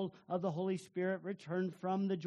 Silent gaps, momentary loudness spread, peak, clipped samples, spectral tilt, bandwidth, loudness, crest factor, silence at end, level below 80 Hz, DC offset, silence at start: none; 3 LU; -22 dBFS; under 0.1%; -7.5 dB/octave; 11 kHz; -39 LUFS; 16 dB; 0 s; -84 dBFS; under 0.1%; 0 s